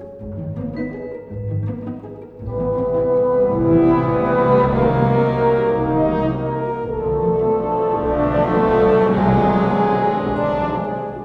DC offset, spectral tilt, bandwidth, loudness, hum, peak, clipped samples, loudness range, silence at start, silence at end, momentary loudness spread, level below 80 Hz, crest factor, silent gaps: under 0.1%; -10 dB/octave; 5.8 kHz; -18 LUFS; none; -4 dBFS; under 0.1%; 4 LU; 0 s; 0 s; 14 LU; -36 dBFS; 14 dB; none